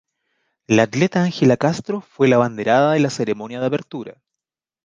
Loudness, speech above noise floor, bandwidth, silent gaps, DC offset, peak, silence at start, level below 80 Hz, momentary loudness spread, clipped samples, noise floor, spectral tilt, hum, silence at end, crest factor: -18 LUFS; 67 dB; 9.6 kHz; none; under 0.1%; -2 dBFS; 0.7 s; -60 dBFS; 11 LU; under 0.1%; -85 dBFS; -6 dB/octave; none; 0.75 s; 18 dB